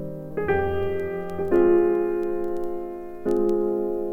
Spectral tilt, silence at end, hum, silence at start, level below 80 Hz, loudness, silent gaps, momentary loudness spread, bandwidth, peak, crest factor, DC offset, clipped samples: -9 dB/octave; 0 s; none; 0 s; -46 dBFS; -24 LUFS; none; 12 LU; 3.4 kHz; -8 dBFS; 16 dB; under 0.1%; under 0.1%